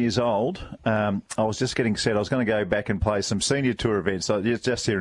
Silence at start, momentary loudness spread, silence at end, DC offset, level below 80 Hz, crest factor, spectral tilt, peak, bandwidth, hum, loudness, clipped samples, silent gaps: 0 s; 3 LU; 0 s; under 0.1%; -44 dBFS; 16 dB; -5 dB/octave; -8 dBFS; 11.5 kHz; none; -24 LUFS; under 0.1%; none